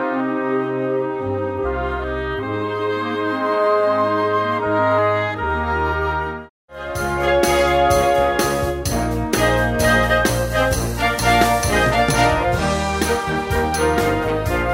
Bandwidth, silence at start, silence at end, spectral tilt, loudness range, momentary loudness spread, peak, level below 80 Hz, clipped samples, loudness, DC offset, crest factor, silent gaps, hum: 16.5 kHz; 0 s; 0 s; -4.5 dB/octave; 4 LU; 8 LU; -2 dBFS; -30 dBFS; under 0.1%; -19 LUFS; under 0.1%; 16 dB; 6.50-6.68 s; none